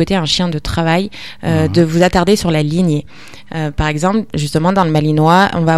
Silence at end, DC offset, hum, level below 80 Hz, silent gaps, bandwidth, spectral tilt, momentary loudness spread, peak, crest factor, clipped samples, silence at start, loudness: 0 s; 2%; none; -32 dBFS; none; 13.5 kHz; -6 dB/octave; 10 LU; 0 dBFS; 14 dB; under 0.1%; 0 s; -14 LUFS